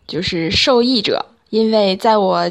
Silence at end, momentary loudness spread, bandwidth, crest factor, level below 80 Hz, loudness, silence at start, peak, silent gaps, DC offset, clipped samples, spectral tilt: 0 s; 8 LU; 12 kHz; 14 dB; -44 dBFS; -15 LUFS; 0.1 s; -2 dBFS; none; under 0.1%; under 0.1%; -4.5 dB/octave